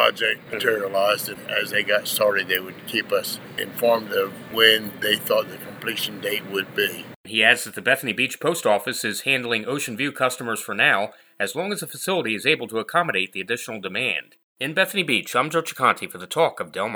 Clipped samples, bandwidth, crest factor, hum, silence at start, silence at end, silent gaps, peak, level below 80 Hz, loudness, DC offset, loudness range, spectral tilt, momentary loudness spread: under 0.1%; over 20 kHz; 24 dB; none; 0 s; 0 s; 7.16-7.24 s, 14.43-14.56 s; 0 dBFS; -72 dBFS; -22 LUFS; under 0.1%; 2 LU; -2.5 dB/octave; 9 LU